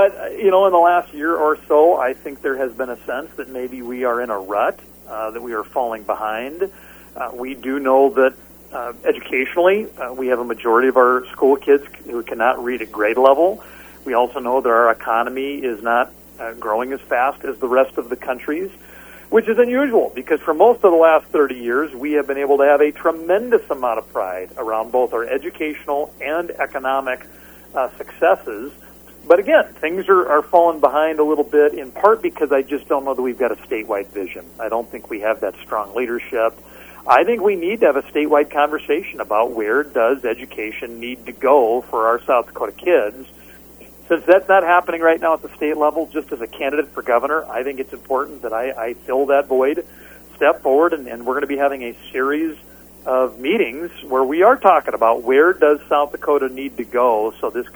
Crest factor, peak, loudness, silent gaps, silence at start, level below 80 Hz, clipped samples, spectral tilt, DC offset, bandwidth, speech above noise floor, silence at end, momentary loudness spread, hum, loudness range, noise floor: 18 dB; 0 dBFS; -18 LUFS; none; 0 s; -52 dBFS; under 0.1%; -5 dB/octave; under 0.1%; over 20 kHz; 25 dB; 0.05 s; 13 LU; none; 7 LU; -42 dBFS